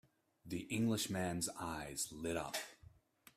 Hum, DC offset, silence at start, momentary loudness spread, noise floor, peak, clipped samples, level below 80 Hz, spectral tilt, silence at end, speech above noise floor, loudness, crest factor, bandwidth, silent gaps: none; under 0.1%; 0.45 s; 9 LU; -65 dBFS; -24 dBFS; under 0.1%; -68 dBFS; -4 dB/octave; 0.5 s; 24 dB; -41 LUFS; 18 dB; 15.5 kHz; none